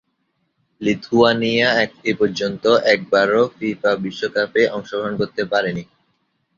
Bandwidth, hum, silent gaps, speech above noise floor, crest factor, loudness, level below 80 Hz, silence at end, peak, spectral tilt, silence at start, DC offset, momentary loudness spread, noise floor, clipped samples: 7.4 kHz; none; none; 51 dB; 18 dB; -18 LUFS; -58 dBFS; 0.75 s; -2 dBFS; -5 dB/octave; 0.8 s; under 0.1%; 8 LU; -69 dBFS; under 0.1%